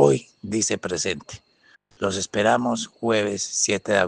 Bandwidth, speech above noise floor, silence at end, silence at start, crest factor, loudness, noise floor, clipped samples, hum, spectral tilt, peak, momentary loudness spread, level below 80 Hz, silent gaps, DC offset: 10.5 kHz; 35 dB; 0 s; 0 s; 20 dB; -23 LUFS; -58 dBFS; under 0.1%; none; -3.5 dB/octave; -2 dBFS; 9 LU; -60 dBFS; none; under 0.1%